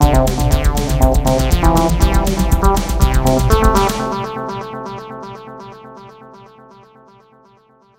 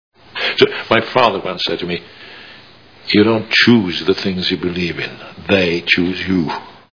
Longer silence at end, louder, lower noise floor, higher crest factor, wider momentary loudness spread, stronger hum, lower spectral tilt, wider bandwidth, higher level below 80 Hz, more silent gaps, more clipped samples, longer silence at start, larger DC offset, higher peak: first, 1.9 s vs 0.25 s; about the same, -15 LUFS vs -15 LUFS; first, -51 dBFS vs -43 dBFS; about the same, 16 dB vs 16 dB; about the same, 19 LU vs 18 LU; neither; about the same, -5.5 dB/octave vs -5.5 dB/octave; first, 16.5 kHz vs 5.4 kHz; first, -18 dBFS vs -50 dBFS; neither; neither; second, 0 s vs 0.35 s; second, under 0.1% vs 0.3%; about the same, 0 dBFS vs 0 dBFS